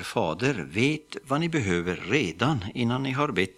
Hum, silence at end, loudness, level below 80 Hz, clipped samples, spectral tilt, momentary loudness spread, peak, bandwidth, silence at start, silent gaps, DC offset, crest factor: none; 0.05 s; -27 LUFS; -56 dBFS; under 0.1%; -5.5 dB/octave; 3 LU; -6 dBFS; 14.5 kHz; 0 s; none; under 0.1%; 20 dB